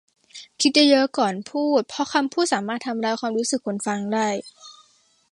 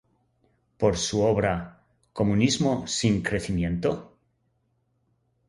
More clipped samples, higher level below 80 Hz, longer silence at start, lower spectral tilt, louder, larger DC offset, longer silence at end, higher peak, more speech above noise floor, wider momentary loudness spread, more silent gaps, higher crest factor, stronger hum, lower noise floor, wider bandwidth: neither; second, -72 dBFS vs -46 dBFS; second, 0.35 s vs 0.8 s; second, -3 dB/octave vs -5 dB/octave; first, -22 LUFS vs -25 LUFS; neither; second, 0.6 s vs 1.45 s; about the same, -4 dBFS vs -6 dBFS; second, 39 dB vs 47 dB; about the same, 10 LU vs 9 LU; neither; about the same, 20 dB vs 20 dB; neither; second, -61 dBFS vs -71 dBFS; about the same, 11.5 kHz vs 11.5 kHz